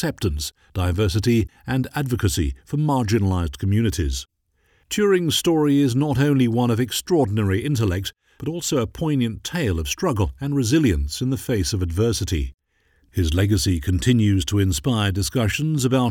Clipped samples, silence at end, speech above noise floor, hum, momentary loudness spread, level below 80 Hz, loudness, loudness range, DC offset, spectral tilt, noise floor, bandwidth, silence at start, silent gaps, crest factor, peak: under 0.1%; 0 s; 43 dB; none; 7 LU; -34 dBFS; -21 LUFS; 3 LU; under 0.1%; -5.5 dB/octave; -63 dBFS; 17.5 kHz; 0 s; none; 16 dB; -4 dBFS